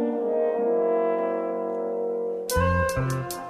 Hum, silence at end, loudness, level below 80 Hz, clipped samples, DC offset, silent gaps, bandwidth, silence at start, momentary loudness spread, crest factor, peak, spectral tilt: none; 0 s; -25 LUFS; -42 dBFS; under 0.1%; under 0.1%; none; 15.5 kHz; 0 s; 5 LU; 14 dB; -10 dBFS; -6 dB/octave